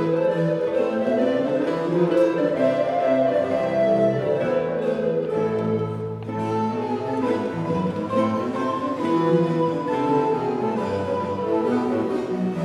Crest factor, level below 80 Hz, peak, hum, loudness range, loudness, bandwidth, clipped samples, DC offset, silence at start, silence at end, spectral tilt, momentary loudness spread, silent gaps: 14 dB; -60 dBFS; -8 dBFS; none; 4 LU; -22 LUFS; 11 kHz; under 0.1%; under 0.1%; 0 s; 0 s; -8 dB/octave; 5 LU; none